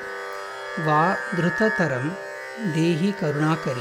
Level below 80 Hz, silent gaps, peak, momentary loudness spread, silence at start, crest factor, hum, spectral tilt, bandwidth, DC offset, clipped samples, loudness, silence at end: -62 dBFS; none; -8 dBFS; 12 LU; 0 s; 16 dB; none; -6.5 dB/octave; 15 kHz; under 0.1%; under 0.1%; -24 LUFS; 0 s